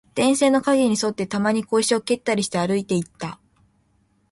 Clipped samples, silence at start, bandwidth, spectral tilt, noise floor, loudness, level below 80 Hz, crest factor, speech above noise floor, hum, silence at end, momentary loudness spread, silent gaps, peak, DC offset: under 0.1%; 0.15 s; 11.5 kHz; -4.5 dB/octave; -64 dBFS; -21 LUFS; -60 dBFS; 16 dB; 43 dB; none; 1 s; 8 LU; none; -6 dBFS; under 0.1%